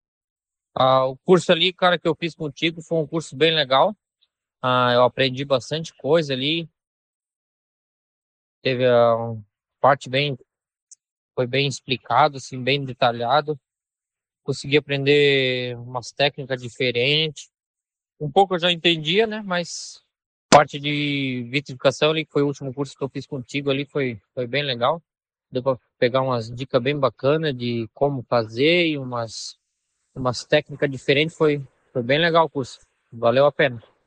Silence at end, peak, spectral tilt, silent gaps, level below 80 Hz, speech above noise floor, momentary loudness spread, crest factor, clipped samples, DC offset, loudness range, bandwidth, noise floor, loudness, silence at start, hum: 0.25 s; -2 dBFS; -5 dB/octave; 6.87-7.20 s, 7.36-8.62 s, 10.82-10.87 s, 11.12-11.29 s, 17.66-17.74 s, 20.26-20.49 s; -62 dBFS; 69 dB; 13 LU; 20 dB; under 0.1%; under 0.1%; 4 LU; 9.8 kHz; -90 dBFS; -21 LUFS; 0.75 s; none